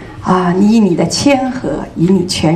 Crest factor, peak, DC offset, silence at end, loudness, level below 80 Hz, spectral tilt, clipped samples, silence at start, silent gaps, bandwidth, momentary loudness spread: 12 dB; 0 dBFS; under 0.1%; 0 s; -12 LUFS; -38 dBFS; -5.5 dB/octave; under 0.1%; 0 s; none; 13 kHz; 8 LU